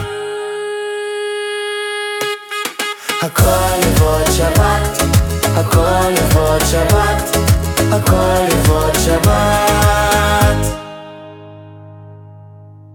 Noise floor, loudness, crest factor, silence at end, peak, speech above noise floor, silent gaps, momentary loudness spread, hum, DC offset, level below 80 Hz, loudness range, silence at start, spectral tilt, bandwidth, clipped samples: -37 dBFS; -14 LUFS; 14 dB; 0 s; 0 dBFS; 25 dB; none; 9 LU; none; under 0.1%; -24 dBFS; 5 LU; 0 s; -4.5 dB/octave; 19 kHz; under 0.1%